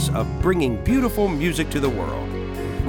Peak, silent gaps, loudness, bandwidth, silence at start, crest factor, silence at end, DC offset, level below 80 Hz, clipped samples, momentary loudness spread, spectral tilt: -6 dBFS; none; -22 LUFS; 20 kHz; 0 s; 14 dB; 0 s; under 0.1%; -30 dBFS; under 0.1%; 8 LU; -6 dB/octave